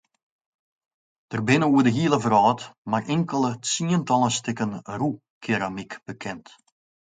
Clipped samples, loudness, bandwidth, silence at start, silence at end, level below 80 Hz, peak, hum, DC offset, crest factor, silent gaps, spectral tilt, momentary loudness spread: under 0.1%; -23 LUFS; 9.6 kHz; 1.3 s; 0.7 s; -64 dBFS; -4 dBFS; none; under 0.1%; 20 dB; 2.78-2.85 s, 5.30-5.41 s; -5 dB/octave; 15 LU